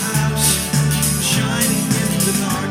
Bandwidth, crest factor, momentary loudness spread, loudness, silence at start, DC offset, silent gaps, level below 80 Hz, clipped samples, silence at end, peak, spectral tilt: 17 kHz; 16 dB; 3 LU; -16 LUFS; 0 s; under 0.1%; none; -36 dBFS; under 0.1%; 0 s; -2 dBFS; -3.5 dB/octave